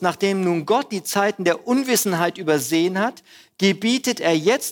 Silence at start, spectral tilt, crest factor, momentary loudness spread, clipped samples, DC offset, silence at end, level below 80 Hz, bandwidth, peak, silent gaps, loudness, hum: 0 s; -4 dB/octave; 16 dB; 3 LU; under 0.1%; under 0.1%; 0 s; -70 dBFS; 20 kHz; -4 dBFS; none; -20 LUFS; none